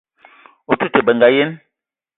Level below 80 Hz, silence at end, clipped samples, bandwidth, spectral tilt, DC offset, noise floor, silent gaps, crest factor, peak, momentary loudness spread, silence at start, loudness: -58 dBFS; 0.6 s; under 0.1%; 4.1 kHz; -10 dB/octave; under 0.1%; -80 dBFS; none; 18 dB; 0 dBFS; 9 LU; 0.7 s; -15 LUFS